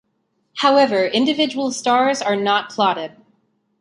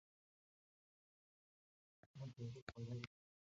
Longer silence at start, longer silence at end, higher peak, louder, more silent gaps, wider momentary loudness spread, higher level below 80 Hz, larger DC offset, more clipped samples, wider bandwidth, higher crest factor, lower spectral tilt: second, 0.55 s vs 2.05 s; first, 0.7 s vs 0.45 s; first, -2 dBFS vs -30 dBFS; first, -18 LUFS vs -53 LUFS; second, none vs 2.06-2.14 s, 2.62-2.67 s; about the same, 8 LU vs 7 LU; first, -68 dBFS vs -78 dBFS; neither; neither; first, 11.5 kHz vs 7.4 kHz; second, 18 dB vs 26 dB; second, -3.5 dB/octave vs -6 dB/octave